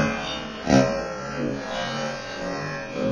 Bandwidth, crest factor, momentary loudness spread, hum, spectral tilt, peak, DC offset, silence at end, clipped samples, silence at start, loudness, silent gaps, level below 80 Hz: 10.5 kHz; 20 dB; 10 LU; none; -5 dB/octave; -4 dBFS; under 0.1%; 0 s; under 0.1%; 0 s; -26 LUFS; none; -46 dBFS